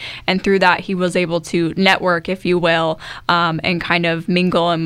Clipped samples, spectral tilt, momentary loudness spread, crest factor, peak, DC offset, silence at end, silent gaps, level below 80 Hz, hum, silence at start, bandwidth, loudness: under 0.1%; -5.5 dB/octave; 5 LU; 16 dB; 0 dBFS; under 0.1%; 0 s; none; -46 dBFS; none; 0 s; 13 kHz; -16 LUFS